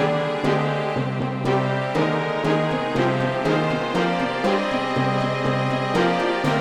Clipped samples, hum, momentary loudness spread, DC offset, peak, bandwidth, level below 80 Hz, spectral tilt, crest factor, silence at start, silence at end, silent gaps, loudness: under 0.1%; none; 2 LU; 0.2%; -8 dBFS; 12.5 kHz; -50 dBFS; -6.5 dB/octave; 14 dB; 0 s; 0 s; none; -22 LUFS